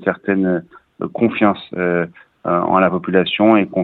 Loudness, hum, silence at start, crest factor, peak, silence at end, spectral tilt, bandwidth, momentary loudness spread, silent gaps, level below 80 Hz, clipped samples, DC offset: -17 LUFS; none; 0 s; 16 dB; 0 dBFS; 0 s; -9.5 dB/octave; 4.3 kHz; 13 LU; none; -58 dBFS; under 0.1%; under 0.1%